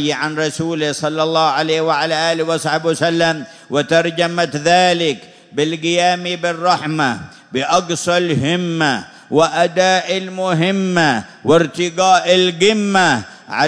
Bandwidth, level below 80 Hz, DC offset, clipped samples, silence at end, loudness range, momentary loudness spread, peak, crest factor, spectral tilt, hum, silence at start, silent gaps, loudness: 11 kHz; -58 dBFS; under 0.1%; under 0.1%; 0 s; 3 LU; 7 LU; 0 dBFS; 16 dB; -4 dB/octave; none; 0 s; none; -16 LUFS